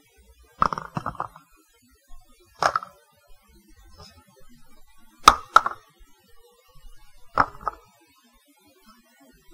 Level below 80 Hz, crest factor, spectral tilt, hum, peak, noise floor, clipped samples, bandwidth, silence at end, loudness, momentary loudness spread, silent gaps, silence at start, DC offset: -48 dBFS; 28 dB; -2.5 dB/octave; none; 0 dBFS; -60 dBFS; under 0.1%; 16 kHz; 1.85 s; -23 LUFS; 19 LU; none; 0.6 s; under 0.1%